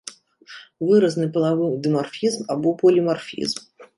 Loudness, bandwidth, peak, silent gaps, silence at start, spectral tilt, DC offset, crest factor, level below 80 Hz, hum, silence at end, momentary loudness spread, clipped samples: -21 LUFS; 11.5 kHz; -6 dBFS; none; 0.05 s; -6 dB/octave; under 0.1%; 16 dB; -68 dBFS; none; 0.15 s; 13 LU; under 0.1%